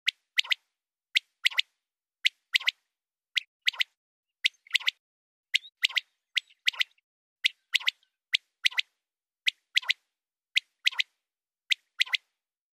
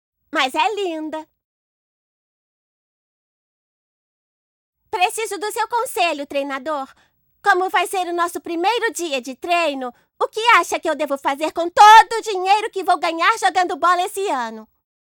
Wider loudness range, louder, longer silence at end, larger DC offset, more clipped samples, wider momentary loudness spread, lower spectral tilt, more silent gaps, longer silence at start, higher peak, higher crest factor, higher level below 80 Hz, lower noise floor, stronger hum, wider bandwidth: second, 1 LU vs 13 LU; second, -28 LUFS vs -18 LUFS; first, 0.65 s vs 0.45 s; neither; neither; second, 5 LU vs 11 LU; second, 10 dB/octave vs -0.5 dB/octave; second, 3.47-3.60 s, 3.97-4.23 s, 4.99-5.43 s, 7.04-7.36 s vs 1.44-4.73 s; second, 0.05 s vs 0.35 s; second, -8 dBFS vs -2 dBFS; first, 24 dB vs 18 dB; second, under -90 dBFS vs -62 dBFS; about the same, under -90 dBFS vs under -90 dBFS; neither; second, 15.5 kHz vs 18 kHz